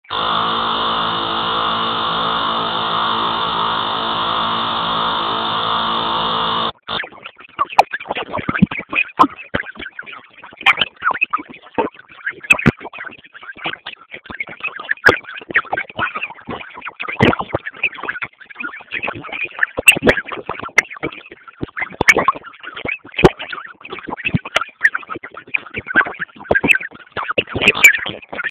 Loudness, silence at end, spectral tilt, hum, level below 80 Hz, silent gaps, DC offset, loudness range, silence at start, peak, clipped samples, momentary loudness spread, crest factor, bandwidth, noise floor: -17 LUFS; 0 s; -3.5 dB/octave; none; -44 dBFS; none; under 0.1%; 5 LU; 0.1 s; 0 dBFS; 0.3%; 17 LU; 20 dB; 16 kHz; -38 dBFS